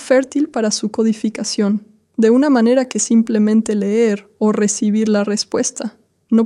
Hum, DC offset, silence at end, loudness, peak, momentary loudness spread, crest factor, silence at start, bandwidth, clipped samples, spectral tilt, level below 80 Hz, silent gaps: none; under 0.1%; 0 s; -16 LUFS; -2 dBFS; 7 LU; 14 dB; 0 s; 11.5 kHz; under 0.1%; -4.5 dB/octave; -62 dBFS; none